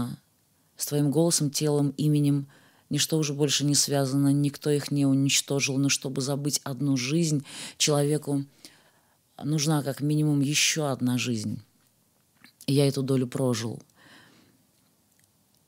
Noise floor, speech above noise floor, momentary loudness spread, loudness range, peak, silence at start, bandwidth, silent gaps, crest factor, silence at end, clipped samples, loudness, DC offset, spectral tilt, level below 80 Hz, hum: -66 dBFS; 41 dB; 10 LU; 5 LU; -10 dBFS; 0 s; 16 kHz; none; 18 dB; 1.9 s; under 0.1%; -25 LUFS; under 0.1%; -4.5 dB/octave; -76 dBFS; none